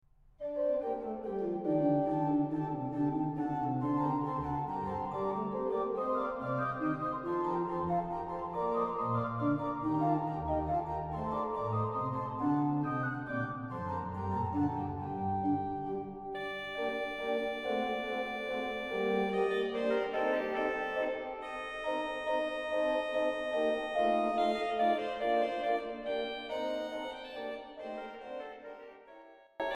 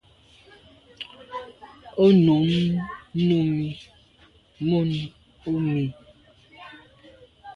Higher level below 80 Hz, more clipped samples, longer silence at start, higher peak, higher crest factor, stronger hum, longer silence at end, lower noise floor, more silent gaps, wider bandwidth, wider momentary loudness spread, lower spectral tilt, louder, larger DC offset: about the same, -58 dBFS vs -56 dBFS; neither; second, 0.4 s vs 1 s; second, -18 dBFS vs -6 dBFS; about the same, 16 dB vs 18 dB; neither; about the same, 0 s vs 0 s; about the same, -56 dBFS vs -56 dBFS; neither; first, 10.5 kHz vs 7 kHz; second, 9 LU vs 23 LU; about the same, -7.5 dB/octave vs -8.5 dB/octave; second, -34 LUFS vs -23 LUFS; neither